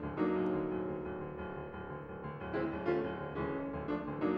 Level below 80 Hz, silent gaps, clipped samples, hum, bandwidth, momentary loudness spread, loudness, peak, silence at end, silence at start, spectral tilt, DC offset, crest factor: -56 dBFS; none; under 0.1%; none; 5.4 kHz; 10 LU; -38 LUFS; -22 dBFS; 0 s; 0 s; -9.5 dB/octave; under 0.1%; 16 dB